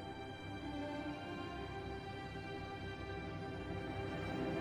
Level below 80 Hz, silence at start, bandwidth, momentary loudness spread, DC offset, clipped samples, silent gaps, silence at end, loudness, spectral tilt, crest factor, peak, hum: -58 dBFS; 0 s; 13.5 kHz; 4 LU; under 0.1%; under 0.1%; none; 0 s; -45 LUFS; -6.5 dB/octave; 14 dB; -30 dBFS; none